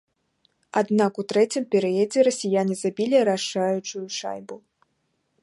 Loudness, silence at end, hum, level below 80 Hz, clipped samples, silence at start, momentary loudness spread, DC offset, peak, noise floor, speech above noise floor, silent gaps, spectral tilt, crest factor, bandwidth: -23 LUFS; 0.85 s; none; -76 dBFS; under 0.1%; 0.75 s; 10 LU; under 0.1%; -6 dBFS; -73 dBFS; 50 dB; none; -4.5 dB/octave; 18 dB; 11.5 kHz